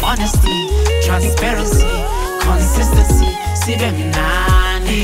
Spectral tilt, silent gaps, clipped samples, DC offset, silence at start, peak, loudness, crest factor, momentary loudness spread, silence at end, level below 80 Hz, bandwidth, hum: -4.5 dB/octave; none; under 0.1%; under 0.1%; 0 s; -2 dBFS; -15 LUFS; 12 dB; 4 LU; 0 s; -16 dBFS; 16.5 kHz; none